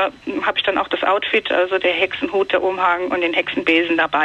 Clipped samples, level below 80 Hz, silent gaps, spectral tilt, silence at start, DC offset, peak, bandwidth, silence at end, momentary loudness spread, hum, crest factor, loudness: under 0.1%; -56 dBFS; none; -4.5 dB/octave; 0 s; under 0.1%; -2 dBFS; 8.4 kHz; 0 s; 3 LU; none; 16 dB; -18 LUFS